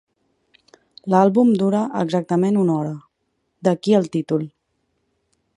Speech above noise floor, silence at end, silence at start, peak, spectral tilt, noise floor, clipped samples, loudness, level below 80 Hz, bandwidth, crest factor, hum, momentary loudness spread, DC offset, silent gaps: 54 dB; 1.1 s; 1.05 s; -2 dBFS; -8 dB/octave; -72 dBFS; under 0.1%; -19 LUFS; -68 dBFS; 11 kHz; 18 dB; none; 12 LU; under 0.1%; none